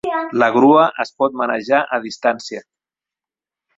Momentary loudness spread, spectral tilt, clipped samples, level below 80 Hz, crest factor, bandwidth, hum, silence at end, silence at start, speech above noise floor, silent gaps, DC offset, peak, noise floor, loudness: 13 LU; -5.5 dB/octave; under 0.1%; -62 dBFS; 16 dB; 7.8 kHz; none; 1.15 s; 0.05 s; 73 dB; none; under 0.1%; -2 dBFS; -89 dBFS; -16 LUFS